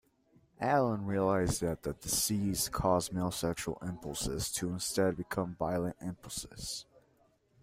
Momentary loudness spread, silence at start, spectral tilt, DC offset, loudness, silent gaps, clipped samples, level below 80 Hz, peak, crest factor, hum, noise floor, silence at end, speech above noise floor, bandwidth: 10 LU; 0.6 s; -4.5 dB/octave; under 0.1%; -34 LUFS; none; under 0.1%; -54 dBFS; -16 dBFS; 20 dB; none; -70 dBFS; 0.8 s; 36 dB; 16 kHz